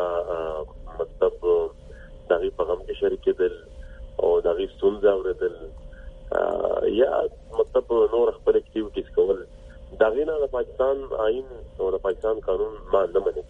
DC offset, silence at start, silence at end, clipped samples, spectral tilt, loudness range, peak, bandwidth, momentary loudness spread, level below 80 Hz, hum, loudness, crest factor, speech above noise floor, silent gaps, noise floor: under 0.1%; 0 s; 0.05 s; under 0.1%; -7.5 dB/octave; 2 LU; -6 dBFS; 3.9 kHz; 13 LU; -44 dBFS; none; -24 LUFS; 18 dB; 19 dB; none; -43 dBFS